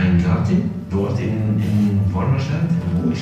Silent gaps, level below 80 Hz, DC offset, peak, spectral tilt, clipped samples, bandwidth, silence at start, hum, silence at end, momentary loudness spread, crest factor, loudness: none; -38 dBFS; under 0.1%; -6 dBFS; -8.5 dB/octave; under 0.1%; 8.2 kHz; 0 s; none; 0 s; 4 LU; 12 dB; -19 LUFS